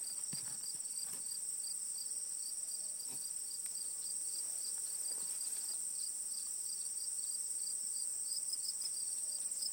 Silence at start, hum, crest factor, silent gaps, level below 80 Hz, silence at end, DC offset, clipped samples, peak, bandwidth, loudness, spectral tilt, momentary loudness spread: 0 s; none; 16 dB; none; under -90 dBFS; 0 s; under 0.1%; under 0.1%; -26 dBFS; 19 kHz; -38 LUFS; 2 dB/octave; 3 LU